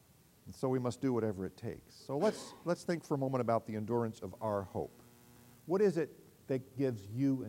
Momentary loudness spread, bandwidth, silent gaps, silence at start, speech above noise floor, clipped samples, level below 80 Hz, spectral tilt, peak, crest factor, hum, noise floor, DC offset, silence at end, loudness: 10 LU; 16 kHz; none; 0.45 s; 25 dB; under 0.1%; -72 dBFS; -7 dB/octave; -18 dBFS; 18 dB; none; -60 dBFS; under 0.1%; 0 s; -36 LUFS